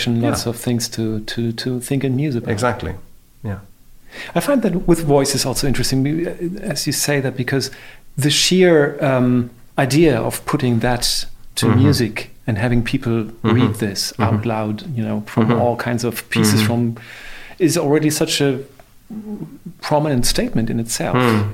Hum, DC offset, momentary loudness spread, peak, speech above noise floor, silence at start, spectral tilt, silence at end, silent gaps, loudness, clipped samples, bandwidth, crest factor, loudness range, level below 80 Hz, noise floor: none; 0.2%; 14 LU; -2 dBFS; 24 dB; 0 s; -5 dB/octave; 0 s; none; -18 LUFS; under 0.1%; 16.5 kHz; 16 dB; 5 LU; -34 dBFS; -42 dBFS